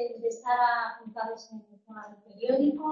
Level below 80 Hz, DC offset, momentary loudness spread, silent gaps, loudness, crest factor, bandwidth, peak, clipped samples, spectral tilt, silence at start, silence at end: -76 dBFS; under 0.1%; 22 LU; none; -29 LUFS; 16 dB; 7.6 kHz; -14 dBFS; under 0.1%; -5 dB/octave; 0 s; 0 s